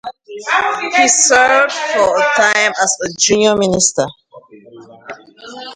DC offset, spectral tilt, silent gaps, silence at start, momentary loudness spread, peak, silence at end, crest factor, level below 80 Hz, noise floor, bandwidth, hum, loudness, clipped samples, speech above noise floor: under 0.1%; -1.5 dB/octave; none; 0.05 s; 21 LU; 0 dBFS; 0 s; 14 dB; -52 dBFS; -40 dBFS; 11 kHz; none; -12 LUFS; under 0.1%; 27 dB